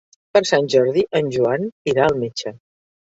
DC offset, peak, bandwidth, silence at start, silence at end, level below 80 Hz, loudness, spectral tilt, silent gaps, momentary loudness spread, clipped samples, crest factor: under 0.1%; 0 dBFS; 8 kHz; 0.35 s; 0.55 s; -56 dBFS; -19 LUFS; -5 dB/octave; 1.72-1.85 s; 9 LU; under 0.1%; 18 dB